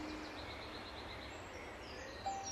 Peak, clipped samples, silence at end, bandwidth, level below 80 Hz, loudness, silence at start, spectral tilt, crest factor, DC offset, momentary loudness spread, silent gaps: -32 dBFS; under 0.1%; 0 s; 13 kHz; -60 dBFS; -47 LUFS; 0 s; -3.5 dB/octave; 16 dB; under 0.1%; 5 LU; none